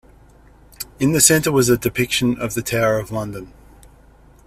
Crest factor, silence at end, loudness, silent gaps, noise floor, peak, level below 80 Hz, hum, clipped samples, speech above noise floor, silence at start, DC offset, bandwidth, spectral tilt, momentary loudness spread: 20 dB; 1 s; -17 LUFS; none; -48 dBFS; 0 dBFS; -44 dBFS; none; under 0.1%; 30 dB; 0.8 s; under 0.1%; 16 kHz; -3.5 dB/octave; 19 LU